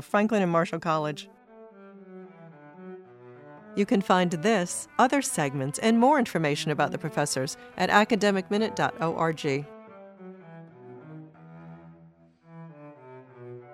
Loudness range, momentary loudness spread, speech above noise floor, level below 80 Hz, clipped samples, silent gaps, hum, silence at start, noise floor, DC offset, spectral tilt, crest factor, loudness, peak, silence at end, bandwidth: 15 LU; 25 LU; 31 dB; -68 dBFS; under 0.1%; none; none; 0 s; -56 dBFS; under 0.1%; -5 dB/octave; 22 dB; -25 LUFS; -6 dBFS; 0 s; 15.5 kHz